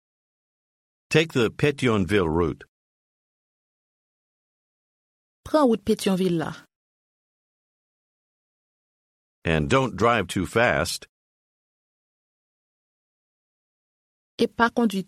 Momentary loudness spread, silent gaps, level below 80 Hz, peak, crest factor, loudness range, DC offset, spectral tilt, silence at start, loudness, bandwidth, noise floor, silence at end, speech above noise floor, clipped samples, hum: 8 LU; 2.68-5.44 s, 6.76-9.42 s, 11.09-14.38 s; -50 dBFS; -6 dBFS; 22 dB; 9 LU; under 0.1%; -5.5 dB/octave; 1.1 s; -23 LUFS; 15.5 kHz; under -90 dBFS; 0.05 s; over 68 dB; under 0.1%; none